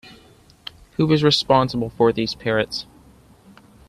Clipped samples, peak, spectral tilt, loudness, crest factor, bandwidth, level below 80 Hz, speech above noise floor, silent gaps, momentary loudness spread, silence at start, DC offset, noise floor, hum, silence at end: under 0.1%; -2 dBFS; -6 dB/octave; -19 LUFS; 20 dB; 13.5 kHz; -50 dBFS; 32 dB; none; 20 LU; 0.05 s; under 0.1%; -51 dBFS; none; 1.05 s